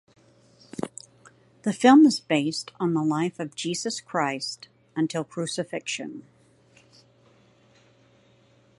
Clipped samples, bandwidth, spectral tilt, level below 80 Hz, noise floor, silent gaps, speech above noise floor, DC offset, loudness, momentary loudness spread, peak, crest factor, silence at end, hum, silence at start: under 0.1%; 11.5 kHz; -4.5 dB/octave; -72 dBFS; -59 dBFS; none; 36 dB; under 0.1%; -25 LUFS; 20 LU; -4 dBFS; 22 dB; 2.6 s; none; 0.8 s